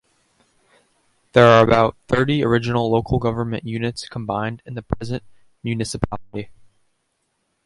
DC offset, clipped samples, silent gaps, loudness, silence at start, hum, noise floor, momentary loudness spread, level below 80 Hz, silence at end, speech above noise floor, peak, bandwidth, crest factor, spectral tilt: under 0.1%; under 0.1%; none; -19 LUFS; 1.35 s; none; -71 dBFS; 18 LU; -42 dBFS; 1.15 s; 52 dB; 0 dBFS; 11.5 kHz; 20 dB; -6.5 dB/octave